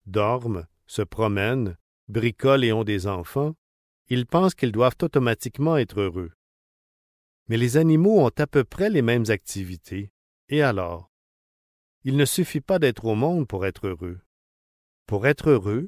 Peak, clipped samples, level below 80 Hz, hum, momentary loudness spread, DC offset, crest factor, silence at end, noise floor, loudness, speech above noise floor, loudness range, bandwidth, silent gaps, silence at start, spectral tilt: -6 dBFS; under 0.1%; -48 dBFS; none; 14 LU; under 0.1%; 18 dB; 0 s; under -90 dBFS; -23 LUFS; over 68 dB; 4 LU; 16 kHz; 1.81-2.07 s, 3.58-4.06 s, 6.34-7.46 s, 10.10-10.48 s, 11.09-12.01 s, 14.26-15.06 s; 0.05 s; -6.5 dB/octave